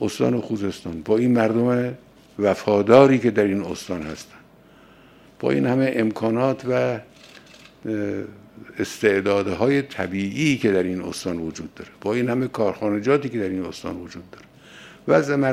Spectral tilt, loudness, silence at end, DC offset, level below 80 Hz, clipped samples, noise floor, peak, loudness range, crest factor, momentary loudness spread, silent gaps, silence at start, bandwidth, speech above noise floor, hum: -6.5 dB/octave; -22 LUFS; 0 s; under 0.1%; -58 dBFS; under 0.1%; -50 dBFS; 0 dBFS; 6 LU; 22 dB; 14 LU; none; 0 s; 15 kHz; 29 dB; none